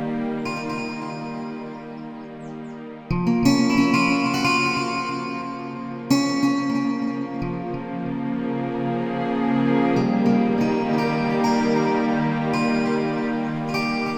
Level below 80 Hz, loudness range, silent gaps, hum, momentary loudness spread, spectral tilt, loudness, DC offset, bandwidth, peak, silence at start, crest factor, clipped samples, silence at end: -48 dBFS; 4 LU; none; none; 13 LU; -6 dB/octave; -22 LUFS; under 0.1%; 17 kHz; -6 dBFS; 0 s; 18 dB; under 0.1%; 0 s